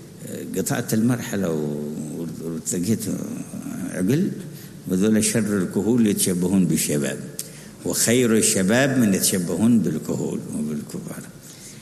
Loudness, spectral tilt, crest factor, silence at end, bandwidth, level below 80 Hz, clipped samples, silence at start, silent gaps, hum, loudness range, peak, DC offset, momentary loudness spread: -22 LUFS; -4.5 dB/octave; 18 dB; 0 s; 13.5 kHz; -58 dBFS; under 0.1%; 0 s; none; none; 6 LU; -4 dBFS; under 0.1%; 15 LU